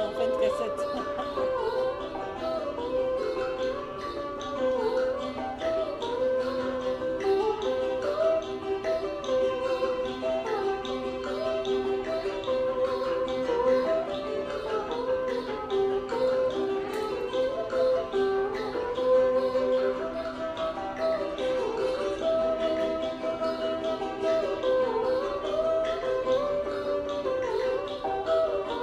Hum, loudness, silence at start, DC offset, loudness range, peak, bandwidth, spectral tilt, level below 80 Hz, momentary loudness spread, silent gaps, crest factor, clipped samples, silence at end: none; -29 LUFS; 0 s; under 0.1%; 3 LU; -14 dBFS; 10.5 kHz; -5 dB/octave; -54 dBFS; 6 LU; none; 14 dB; under 0.1%; 0 s